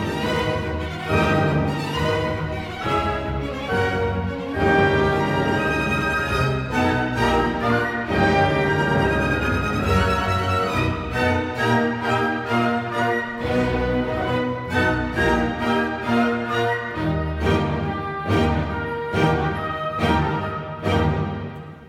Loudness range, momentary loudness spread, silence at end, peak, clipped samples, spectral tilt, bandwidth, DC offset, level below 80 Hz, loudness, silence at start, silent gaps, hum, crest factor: 3 LU; 6 LU; 0 s; -6 dBFS; under 0.1%; -6.5 dB/octave; 16 kHz; under 0.1%; -36 dBFS; -22 LUFS; 0 s; none; none; 16 dB